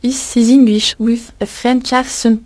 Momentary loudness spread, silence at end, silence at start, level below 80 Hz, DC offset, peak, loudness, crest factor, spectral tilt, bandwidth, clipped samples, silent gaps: 9 LU; 0.05 s; 0 s; -44 dBFS; under 0.1%; 0 dBFS; -13 LUFS; 12 dB; -3.5 dB/octave; 11 kHz; under 0.1%; none